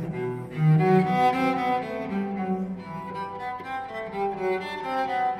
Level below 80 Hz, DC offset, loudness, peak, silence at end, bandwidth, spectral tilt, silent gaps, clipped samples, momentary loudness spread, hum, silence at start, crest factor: -60 dBFS; under 0.1%; -26 LUFS; -8 dBFS; 0 s; 11.5 kHz; -8 dB/octave; none; under 0.1%; 13 LU; none; 0 s; 18 dB